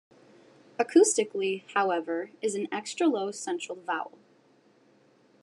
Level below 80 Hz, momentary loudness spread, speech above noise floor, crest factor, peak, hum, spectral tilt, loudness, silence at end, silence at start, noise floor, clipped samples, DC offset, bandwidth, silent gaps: under -90 dBFS; 12 LU; 35 dB; 20 dB; -8 dBFS; none; -3 dB/octave; -28 LUFS; 1.35 s; 0.8 s; -62 dBFS; under 0.1%; under 0.1%; 12 kHz; none